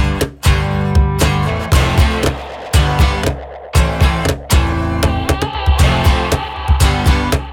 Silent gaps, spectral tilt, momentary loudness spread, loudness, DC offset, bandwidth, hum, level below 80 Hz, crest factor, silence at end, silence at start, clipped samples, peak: none; -5 dB/octave; 5 LU; -15 LUFS; under 0.1%; 17.5 kHz; none; -18 dBFS; 12 dB; 0 s; 0 s; under 0.1%; 0 dBFS